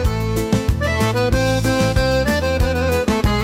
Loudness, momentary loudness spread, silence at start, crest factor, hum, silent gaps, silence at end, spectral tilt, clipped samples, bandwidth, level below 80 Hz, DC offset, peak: -18 LUFS; 2 LU; 0 s; 12 dB; none; none; 0 s; -5.5 dB/octave; under 0.1%; 16.5 kHz; -26 dBFS; under 0.1%; -6 dBFS